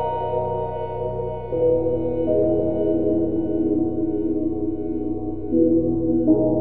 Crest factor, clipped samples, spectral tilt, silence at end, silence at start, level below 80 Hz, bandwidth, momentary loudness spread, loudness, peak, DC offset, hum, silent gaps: 16 dB; under 0.1%; -13 dB/octave; 0 s; 0 s; -42 dBFS; 3.1 kHz; 8 LU; -22 LUFS; -6 dBFS; 2%; none; none